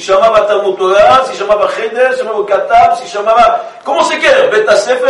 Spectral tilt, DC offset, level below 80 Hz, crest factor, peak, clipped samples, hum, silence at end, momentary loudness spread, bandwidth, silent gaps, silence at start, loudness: -3 dB/octave; under 0.1%; -44 dBFS; 10 dB; 0 dBFS; under 0.1%; none; 0 s; 6 LU; 11.5 kHz; none; 0 s; -10 LUFS